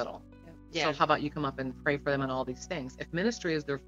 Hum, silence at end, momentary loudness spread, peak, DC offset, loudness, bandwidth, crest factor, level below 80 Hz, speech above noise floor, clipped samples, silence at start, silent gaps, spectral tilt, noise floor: none; 0 s; 10 LU; -12 dBFS; under 0.1%; -32 LUFS; 8 kHz; 20 dB; -54 dBFS; 20 dB; under 0.1%; 0 s; none; -5 dB/octave; -51 dBFS